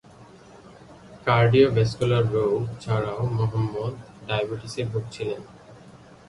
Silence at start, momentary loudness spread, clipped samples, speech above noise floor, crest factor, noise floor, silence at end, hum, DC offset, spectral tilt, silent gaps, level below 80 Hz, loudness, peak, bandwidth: 0.2 s; 13 LU; under 0.1%; 25 dB; 20 dB; -48 dBFS; 0.3 s; none; under 0.1%; -7 dB/octave; none; -50 dBFS; -24 LUFS; -6 dBFS; 11 kHz